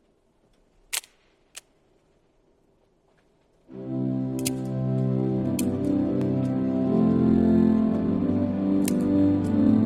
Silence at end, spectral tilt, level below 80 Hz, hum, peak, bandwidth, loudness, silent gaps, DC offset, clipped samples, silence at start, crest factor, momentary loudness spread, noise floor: 0 s; -7 dB/octave; -48 dBFS; none; -10 dBFS; 16 kHz; -24 LUFS; none; under 0.1%; under 0.1%; 0.9 s; 16 dB; 11 LU; -64 dBFS